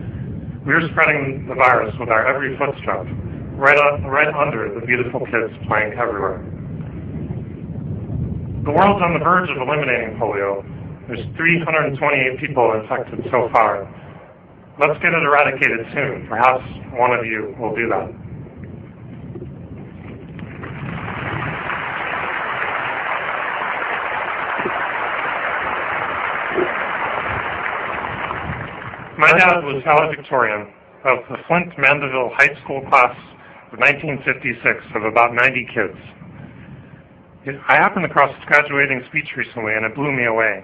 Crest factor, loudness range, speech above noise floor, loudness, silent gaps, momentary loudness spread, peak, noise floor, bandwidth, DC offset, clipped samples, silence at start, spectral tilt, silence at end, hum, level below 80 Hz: 20 dB; 7 LU; 26 dB; -18 LUFS; none; 17 LU; 0 dBFS; -44 dBFS; 8.4 kHz; under 0.1%; under 0.1%; 0 s; -7 dB/octave; 0 s; none; -46 dBFS